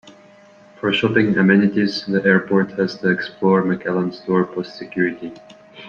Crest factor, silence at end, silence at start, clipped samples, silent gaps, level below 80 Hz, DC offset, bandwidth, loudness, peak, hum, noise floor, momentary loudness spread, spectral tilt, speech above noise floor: 18 dB; 0 s; 0.05 s; under 0.1%; none; -60 dBFS; under 0.1%; 7 kHz; -18 LUFS; -2 dBFS; none; -47 dBFS; 10 LU; -7.5 dB/octave; 29 dB